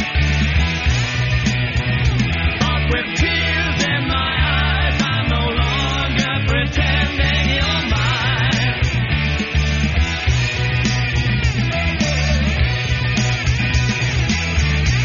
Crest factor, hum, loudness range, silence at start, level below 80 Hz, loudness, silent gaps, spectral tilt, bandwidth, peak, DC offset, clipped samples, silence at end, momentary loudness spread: 14 dB; none; 1 LU; 0 s; -22 dBFS; -17 LUFS; none; -4 dB/octave; 7.4 kHz; -2 dBFS; 0.2%; under 0.1%; 0 s; 2 LU